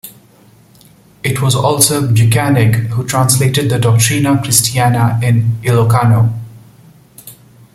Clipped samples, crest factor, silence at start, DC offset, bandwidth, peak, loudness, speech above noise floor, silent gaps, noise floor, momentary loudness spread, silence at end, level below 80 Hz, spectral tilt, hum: under 0.1%; 12 dB; 0.05 s; under 0.1%; 16.5 kHz; 0 dBFS; -12 LUFS; 34 dB; none; -45 dBFS; 6 LU; 0.4 s; -44 dBFS; -4.5 dB/octave; none